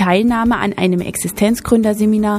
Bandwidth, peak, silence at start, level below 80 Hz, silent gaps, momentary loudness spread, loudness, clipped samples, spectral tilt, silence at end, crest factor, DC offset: 15.5 kHz; 0 dBFS; 0 s; -38 dBFS; none; 4 LU; -15 LUFS; under 0.1%; -5.5 dB/octave; 0 s; 14 dB; under 0.1%